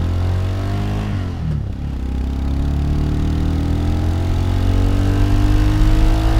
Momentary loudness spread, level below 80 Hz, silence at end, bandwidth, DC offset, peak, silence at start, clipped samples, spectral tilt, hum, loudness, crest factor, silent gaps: 6 LU; -18 dBFS; 0 s; 15 kHz; under 0.1%; -2 dBFS; 0 s; under 0.1%; -7.5 dB/octave; none; -19 LUFS; 14 dB; none